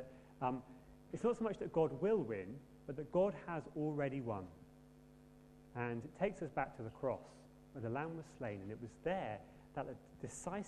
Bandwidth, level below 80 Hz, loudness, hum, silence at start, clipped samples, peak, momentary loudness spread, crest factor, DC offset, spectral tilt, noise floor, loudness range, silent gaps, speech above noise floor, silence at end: 12.5 kHz; -68 dBFS; -42 LUFS; none; 0 s; under 0.1%; -22 dBFS; 17 LU; 20 dB; under 0.1%; -7 dB/octave; -62 dBFS; 6 LU; none; 21 dB; 0 s